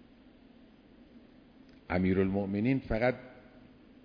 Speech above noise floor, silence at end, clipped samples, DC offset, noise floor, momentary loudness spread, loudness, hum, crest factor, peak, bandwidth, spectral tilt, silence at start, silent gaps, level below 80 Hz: 28 dB; 0.7 s; under 0.1%; under 0.1%; -58 dBFS; 9 LU; -31 LUFS; none; 18 dB; -16 dBFS; 5.2 kHz; -10 dB/octave; 1.15 s; none; -52 dBFS